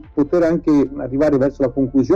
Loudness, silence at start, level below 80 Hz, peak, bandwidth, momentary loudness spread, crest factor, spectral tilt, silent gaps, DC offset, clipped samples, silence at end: -17 LUFS; 0.15 s; -40 dBFS; -6 dBFS; 7.4 kHz; 3 LU; 10 dB; -8.5 dB/octave; none; under 0.1%; under 0.1%; 0 s